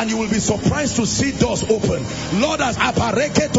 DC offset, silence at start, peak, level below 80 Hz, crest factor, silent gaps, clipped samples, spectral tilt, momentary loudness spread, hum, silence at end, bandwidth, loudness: under 0.1%; 0 s; -2 dBFS; -38 dBFS; 16 dB; none; under 0.1%; -4.5 dB/octave; 2 LU; none; 0 s; 8 kHz; -19 LUFS